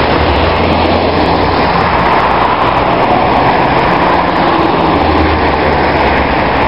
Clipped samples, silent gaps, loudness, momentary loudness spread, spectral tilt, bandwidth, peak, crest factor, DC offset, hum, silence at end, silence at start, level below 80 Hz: 0.1%; none; -10 LUFS; 1 LU; -7.5 dB/octave; 7.6 kHz; 0 dBFS; 10 dB; 2%; none; 0 s; 0 s; -24 dBFS